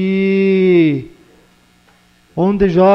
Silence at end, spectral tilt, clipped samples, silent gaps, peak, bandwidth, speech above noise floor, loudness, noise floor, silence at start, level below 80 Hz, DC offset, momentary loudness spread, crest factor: 0 s; -9 dB/octave; under 0.1%; none; -2 dBFS; 6 kHz; 39 dB; -13 LUFS; -51 dBFS; 0 s; -42 dBFS; under 0.1%; 10 LU; 12 dB